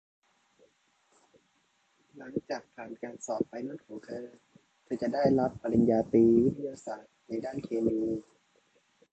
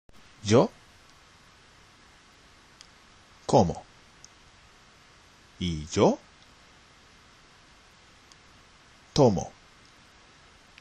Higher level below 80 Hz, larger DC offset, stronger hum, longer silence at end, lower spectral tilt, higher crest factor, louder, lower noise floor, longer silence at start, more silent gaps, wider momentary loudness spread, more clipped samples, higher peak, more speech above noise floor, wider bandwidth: second, -62 dBFS vs -54 dBFS; neither; neither; second, 0.9 s vs 1.3 s; first, -7.5 dB/octave vs -6 dB/octave; about the same, 20 dB vs 24 dB; second, -30 LUFS vs -26 LUFS; first, -72 dBFS vs -56 dBFS; first, 2.15 s vs 0.45 s; neither; first, 19 LU vs 15 LU; neither; second, -12 dBFS vs -6 dBFS; first, 42 dB vs 33 dB; second, 8.2 kHz vs 11.5 kHz